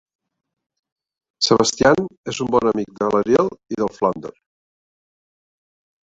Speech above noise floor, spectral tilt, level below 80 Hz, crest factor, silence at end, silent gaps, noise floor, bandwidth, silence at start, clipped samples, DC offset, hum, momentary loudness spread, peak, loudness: over 71 dB; -4 dB/octave; -52 dBFS; 22 dB; 1.75 s; 2.18-2.24 s; under -90 dBFS; 8.2 kHz; 1.4 s; under 0.1%; under 0.1%; none; 10 LU; 0 dBFS; -19 LUFS